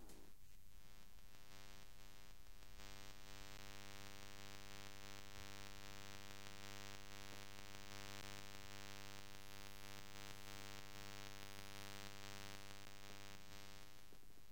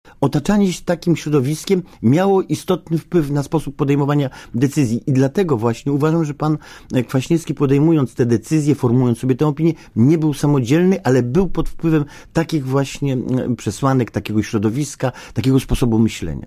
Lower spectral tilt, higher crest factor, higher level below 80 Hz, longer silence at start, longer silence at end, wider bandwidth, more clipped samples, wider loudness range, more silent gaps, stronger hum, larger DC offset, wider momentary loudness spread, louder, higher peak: second, -2.5 dB/octave vs -7 dB/octave; first, 26 dB vs 14 dB; second, -68 dBFS vs -38 dBFS; second, 0 s vs 0.2 s; about the same, 0 s vs 0 s; about the same, 17 kHz vs 15.5 kHz; neither; about the same, 5 LU vs 3 LU; neither; neither; first, 0.2% vs under 0.1%; first, 11 LU vs 6 LU; second, -57 LUFS vs -18 LUFS; second, -34 dBFS vs -4 dBFS